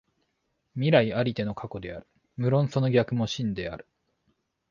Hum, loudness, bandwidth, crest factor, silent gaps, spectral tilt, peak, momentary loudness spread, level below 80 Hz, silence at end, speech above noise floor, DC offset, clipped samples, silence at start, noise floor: none; -26 LUFS; 7.2 kHz; 22 dB; none; -7 dB/octave; -6 dBFS; 18 LU; -56 dBFS; 0.9 s; 51 dB; under 0.1%; under 0.1%; 0.75 s; -76 dBFS